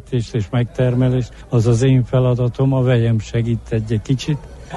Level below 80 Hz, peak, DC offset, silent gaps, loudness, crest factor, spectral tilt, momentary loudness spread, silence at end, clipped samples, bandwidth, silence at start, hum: -38 dBFS; -4 dBFS; under 0.1%; none; -18 LUFS; 12 dB; -7.5 dB/octave; 7 LU; 0 s; under 0.1%; 10 kHz; 0.05 s; none